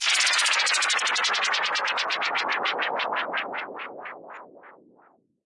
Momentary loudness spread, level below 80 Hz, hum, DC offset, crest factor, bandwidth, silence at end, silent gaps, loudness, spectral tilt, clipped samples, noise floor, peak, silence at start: 19 LU; -88 dBFS; none; under 0.1%; 18 dB; 11.5 kHz; 0.75 s; none; -23 LUFS; 2 dB/octave; under 0.1%; -60 dBFS; -10 dBFS; 0 s